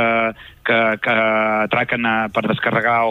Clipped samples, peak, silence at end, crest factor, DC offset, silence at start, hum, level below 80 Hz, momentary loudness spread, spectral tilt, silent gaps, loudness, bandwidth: under 0.1%; -4 dBFS; 0 s; 14 dB; under 0.1%; 0 s; none; -54 dBFS; 4 LU; -7 dB/octave; none; -18 LUFS; 15 kHz